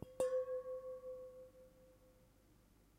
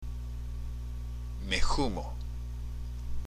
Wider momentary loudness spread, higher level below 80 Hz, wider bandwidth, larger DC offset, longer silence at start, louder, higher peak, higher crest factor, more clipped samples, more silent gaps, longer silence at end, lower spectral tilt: first, 23 LU vs 10 LU; second, -72 dBFS vs -36 dBFS; first, 16 kHz vs 11 kHz; neither; about the same, 0 s vs 0 s; second, -44 LUFS vs -37 LUFS; second, -24 dBFS vs -14 dBFS; about the same, 22 dB vs 20 dB; neither; neither; first, 0.85 s vs 0 s; about the same, -5 dB/octave vs -4.5 dB/octave